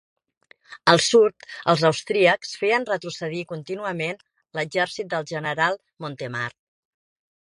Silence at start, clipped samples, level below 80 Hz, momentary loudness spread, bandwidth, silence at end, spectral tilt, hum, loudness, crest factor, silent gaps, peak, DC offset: 0.7 s; under 0.1%; -66 dBFS; 14 LU; 11.5 kHz; 1.1 s; -4 dB/octave; none; -23 LUFS; 24 dB; none; 0 dBFS; under 0.1%